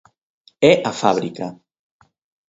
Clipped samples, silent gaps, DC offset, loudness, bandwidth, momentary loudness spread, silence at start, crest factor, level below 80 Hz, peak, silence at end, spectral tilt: under 0.1%; none; under 0.1%; -17 LUFS; 8 kHz; 16 LU; 0.6 s; 20 dB; -60 dBFS; 0 dBFS; 0.95 s; -5 dB/octave